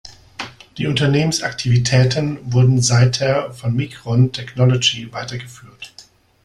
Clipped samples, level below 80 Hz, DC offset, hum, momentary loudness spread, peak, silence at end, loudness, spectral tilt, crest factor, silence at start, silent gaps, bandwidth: under 0.1%; -46 dBFS; under 0.1%; none; 19 LU; -2 dBFS; 0.45 s; -17 LUFS; -5 dB/octave; 16 dB; 0.05 s; none; 11.5 kHz